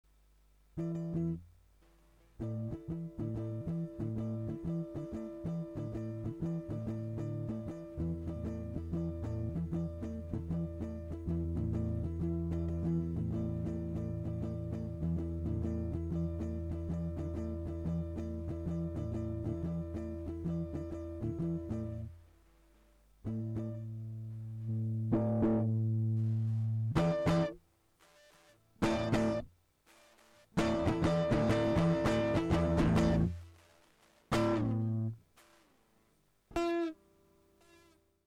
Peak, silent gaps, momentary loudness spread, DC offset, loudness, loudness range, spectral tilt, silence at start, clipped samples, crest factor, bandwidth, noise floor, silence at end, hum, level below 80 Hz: -18 dBFS; none; 11 LU; under 0.1%; -36 LUFS; 9 LU; -8 dB/octave; 0.75 s; under 0.1%; 18 dB; 11.5 kHz; -72 dBFS; 1.3 s; 50 Hz at -65 dBFS; -48 dBFS